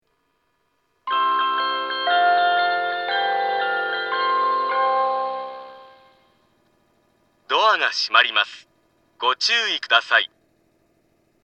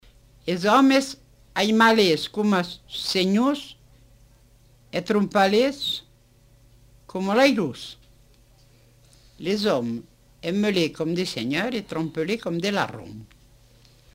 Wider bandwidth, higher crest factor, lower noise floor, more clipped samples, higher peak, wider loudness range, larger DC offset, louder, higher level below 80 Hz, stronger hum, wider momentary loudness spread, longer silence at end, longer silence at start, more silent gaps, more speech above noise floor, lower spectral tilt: second, 8.6 kHz vs 16 kHz; about the same, 22 dB vs 20 dB; first, -69 dBFS vs -56 dBFS; neither; first, 0 dBFS vs -4 dBFS; about the same, 5 LU vs 6 LU; neither; first, -20 LUFS vs -23 LUFS; second, -80 dBFS vs -58 dBFS; neither; second, 9 LU vs 16 LU; first, 1.2 s vs 0.9 s; first, 1.05 s vs 0.45 s; neither; first, 49 dB vs 34 dB; second, 0 dB/octave vs -5 dB/octave